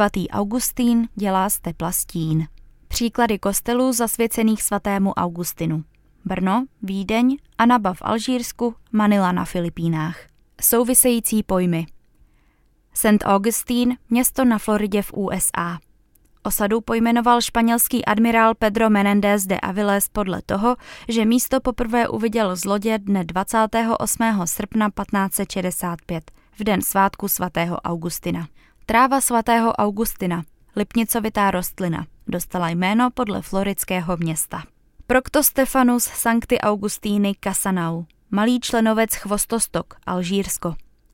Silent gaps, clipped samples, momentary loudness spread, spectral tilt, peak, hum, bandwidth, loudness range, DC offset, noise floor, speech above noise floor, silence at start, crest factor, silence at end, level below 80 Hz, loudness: none; under 0.1%; 9 LU; -4.5 dB/octave; -2 dBFS; none; 17 kHz; 4 LU; under 0.1%; -59 dBFS; 39 dB; 0 s; 20 dB; 0.3 s; -44 dBFS; -20 LUFS